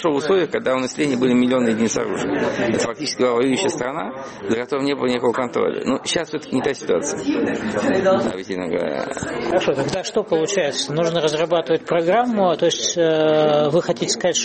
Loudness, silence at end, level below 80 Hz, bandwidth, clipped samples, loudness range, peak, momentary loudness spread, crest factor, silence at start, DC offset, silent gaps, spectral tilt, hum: -20 LUFS; 0 s; -54 dBFS; 8.8 kHz; under 0.1%; 3 LU; -6 dBFS; 7 LU; 12 dB; 0 s; under 0.1%; none; -4 dB/octave; none